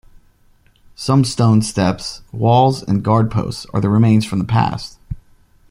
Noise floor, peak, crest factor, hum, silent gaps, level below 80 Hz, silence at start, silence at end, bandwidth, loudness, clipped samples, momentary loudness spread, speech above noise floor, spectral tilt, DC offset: -53 dBFS; 0 dBFS; 16 dB; none; none; -42 dBFS; 1 s; 0.55 s; 12 kHz; -16 LUFS; under 0.1%; 15 LU; 38 dB; -6.5 dB/octave; under 0.1%